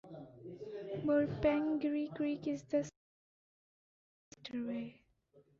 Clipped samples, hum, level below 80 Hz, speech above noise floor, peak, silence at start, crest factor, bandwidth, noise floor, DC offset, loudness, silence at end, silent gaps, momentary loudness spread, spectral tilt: under 0.1%; none; -64 dBFS; 33 dB; -20 dBFS; 0.05 s; 18 dB; 7.4 kHz; -69 dBFS; under 0.1%; -37 LUFS; 0.2 s; 2.96-4.31 s; 18 LU; -6 dB/octave